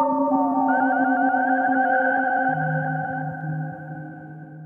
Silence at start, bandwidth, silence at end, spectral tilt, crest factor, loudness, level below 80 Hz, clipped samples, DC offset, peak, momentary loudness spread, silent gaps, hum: 0 s; 3.3 kHz; 0 s; -10.5 dB/octave; 14 dB; -22 LUFS; -68 dBFS; under 0.1%; under 0.1%; -8 dBFS; 16 LU; none; none